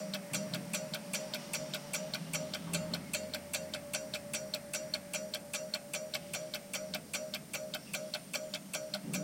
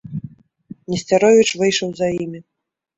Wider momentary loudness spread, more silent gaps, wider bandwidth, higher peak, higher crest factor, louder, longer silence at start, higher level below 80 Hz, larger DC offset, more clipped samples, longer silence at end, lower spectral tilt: second, 2 LU vs 19 LU; neither; first, 17 kHz vs 8.4 kHz; second, -20 dBFS vs -2 dBFS; first, 22 dB vs 16 dB; second, -39 LUFS vs -17 LUFS; about the same, 0 s vs 0.1 s; second, -74 dBFS vs -56 dBFS; neither; neither; second, 0 s vs 0.55 s; second, -2.5 dB/octave vs -4.5 dB/octave